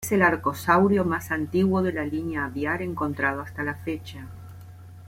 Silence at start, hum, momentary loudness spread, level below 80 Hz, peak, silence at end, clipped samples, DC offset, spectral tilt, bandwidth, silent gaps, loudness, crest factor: 0 s; none; 21 LU; -54 dBFS; -6 dBFS; 0 s; under 0.1%; under 0.1%; -6.5 dB/octave; 16.5 kHz; none; -25 LUFS; 18 dB